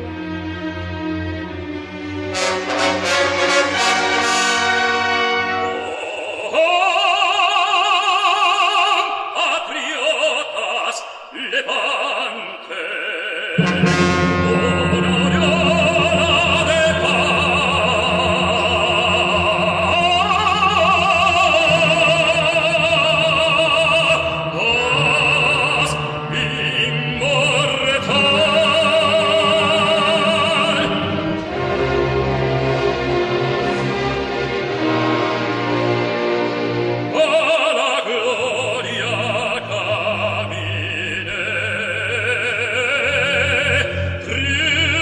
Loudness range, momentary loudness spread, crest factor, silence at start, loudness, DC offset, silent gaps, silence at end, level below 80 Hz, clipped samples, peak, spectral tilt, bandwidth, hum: 6 LU; 9 LU; 14 dB; 0 s; -16 LUFS; under 0.1%; none; 0 s; -44 dBFS; under 0.1%; -2 dBFS; -4 dB/octave; 12.5 kHz; none